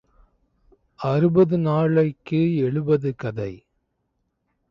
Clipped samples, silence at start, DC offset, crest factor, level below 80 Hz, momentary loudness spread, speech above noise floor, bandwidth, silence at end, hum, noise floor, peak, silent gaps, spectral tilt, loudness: under 0.1%; 1 s; under 0.1%; 16 dB; -56 dBFS; 12 LU; 53 dB; 6 kHz; 1.15 s; none; -74 dBFS; -6 dBFS; none; -10 dB/octave; -21 LUFS